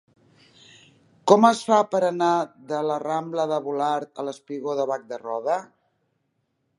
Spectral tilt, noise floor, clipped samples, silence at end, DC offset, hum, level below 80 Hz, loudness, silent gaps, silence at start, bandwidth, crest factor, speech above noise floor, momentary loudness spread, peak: -5 dB/octave; -73 dBFS; under 0.1%; 1.15 s; under 0.1%; none; -78 dBFS; -23 LUFS; none; 1.25 s; 11.5 kHz; 24 dB; 51 dB; 14 LU; -2 dBFS